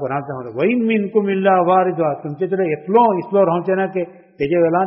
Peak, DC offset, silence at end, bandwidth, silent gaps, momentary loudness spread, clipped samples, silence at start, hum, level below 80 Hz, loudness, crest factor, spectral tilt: -2 dBFS; under 0.1%; 0 s; 5.8 kHz; none; 10 LU; under 0.1%; 0 s; none; -60 dBFS; -17 LUFS; 14 dB; -6 dB/octave